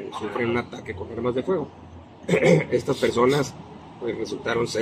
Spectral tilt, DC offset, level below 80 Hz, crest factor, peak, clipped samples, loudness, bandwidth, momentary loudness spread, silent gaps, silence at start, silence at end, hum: -6 dB/octave; under 0.1%; -54 dBFS; 20 dB; -4 dBFS; under 0.1%; -24 LUFS; 15 kHz; 17 LU; none; 0 s; 0 s; none